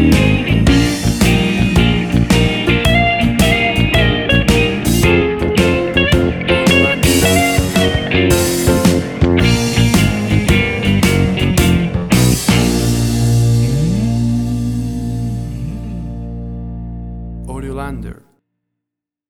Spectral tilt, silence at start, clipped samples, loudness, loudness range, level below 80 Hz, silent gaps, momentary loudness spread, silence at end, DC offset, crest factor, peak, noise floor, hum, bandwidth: -5 dB/octave; 0 s; under 0.1%; -13 LUFS; 11 LU; -24 dBFS; none; 14 LU; 1.15 s; under 0.1%; 12 dB; 0 dBFS; -82 dBFS; 60 Hz at -30 dBFS; 20 kHz